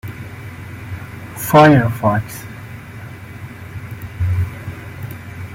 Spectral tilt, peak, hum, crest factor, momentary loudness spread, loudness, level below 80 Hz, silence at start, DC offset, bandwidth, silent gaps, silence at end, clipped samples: -6.5 dB/octave; 0 dBFS; none; 18 dB; 23 LU; -15 LUFS; -42 dBFS; 0.05 s; under 0.1%; 16.5 kHz; none; 0 s; under 0.1%